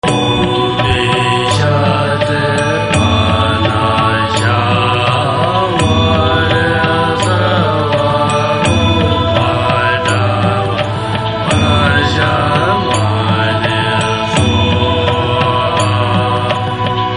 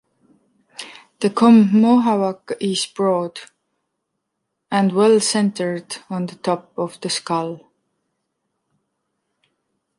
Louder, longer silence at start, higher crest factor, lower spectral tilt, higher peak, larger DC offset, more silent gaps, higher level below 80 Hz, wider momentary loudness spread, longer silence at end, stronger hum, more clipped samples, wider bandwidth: first, -12 LUFS vs -18 LUFS; second, 0.05 s vs 0.8 s; second, 12 dB vs 18 dB; about the same, -5.5 dB/octave vs -5 dB/octave; about the same, 0 dBFS vs -2 dBFS; first, 0.3% vs under 0.1%; neither; first, -28 dBFS vs -70 dBFS; second, 2 LU vs 22 LU; second, 0 s vs 2.4 s; neither; neither; about the same, 10.5 kHz vs 11.5 kHz